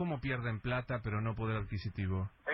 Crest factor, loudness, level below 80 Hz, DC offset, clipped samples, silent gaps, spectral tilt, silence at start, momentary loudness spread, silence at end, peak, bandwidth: 12 dB; -37 LUFS; -52 dBFS; under 0.1%; under 0.1%; none; -10 dB/octave; 0 s; 2 LU; 0 s; -24 dBFS; 5.8 kHz